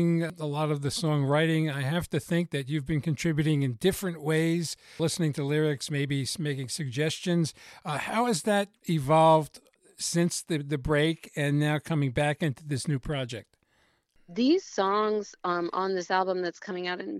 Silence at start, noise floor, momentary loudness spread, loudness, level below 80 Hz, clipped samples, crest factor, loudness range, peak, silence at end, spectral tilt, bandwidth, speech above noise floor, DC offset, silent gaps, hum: 0 s; -69 dBFS; 7 LU; -28 LUFS; -54 dBFS; under 0.1%; 18 dB; 3 LU; -10 dBFS; 0 s; -5.5 dB/octave; 14.5 kHz; 41 dB; under 0.1%; none; none